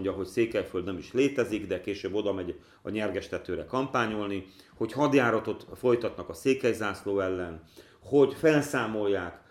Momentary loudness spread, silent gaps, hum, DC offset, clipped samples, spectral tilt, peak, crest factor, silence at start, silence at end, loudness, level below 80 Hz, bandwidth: 11 LU; none; none; under 0.1%; under 0.1%; -6 dB/octave; -10 dBFS; 20 dB; 0 s; 0.1 s; -29 LUFS; -60 dBFS; 15.5 kHz